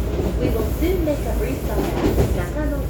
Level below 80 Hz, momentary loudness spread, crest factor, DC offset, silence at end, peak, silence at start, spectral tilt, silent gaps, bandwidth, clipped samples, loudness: -24 dBFS; 4 LU; 16 dB; under 0.1%; 0 s; -6 dBFS; 0 s; -7 dB/octave; none; over 20 kHz; under 0.1%; -22 LUFS